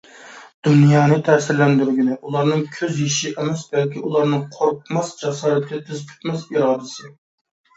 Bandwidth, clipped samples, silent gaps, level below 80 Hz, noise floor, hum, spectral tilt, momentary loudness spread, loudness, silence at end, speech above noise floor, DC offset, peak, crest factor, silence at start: 8 kHz; under 0.1%; 0.54-0.62 s; -64 dBFS; -42 dBFS; none; -6 dB/octave; 13 LU; -19 LUFS; 0.65 s; 23 dB; under 0.1%; 0 dBFS; 18 dB; 0.2 s